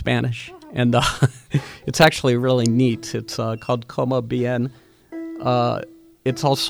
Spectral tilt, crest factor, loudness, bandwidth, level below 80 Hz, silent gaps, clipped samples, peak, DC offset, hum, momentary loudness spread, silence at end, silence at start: -5.5 dB/octave; 20 dB; -21 LUFS; over 20 kHz; -46 dBFS; none; under 0.1%; 0 dBFS; under 0.1%; none; 13 LU; 0 s; 0 s